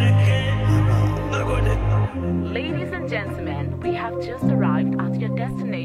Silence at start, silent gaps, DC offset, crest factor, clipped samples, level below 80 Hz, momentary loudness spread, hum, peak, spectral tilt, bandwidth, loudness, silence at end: 0 s; none; under 0.1%; 12 dB; under 0.1%; -32 dBFS; 8 LU; none; -8 dBFS; -7.5 dB/octave; 11 kHz; -22 LUFS; 0 s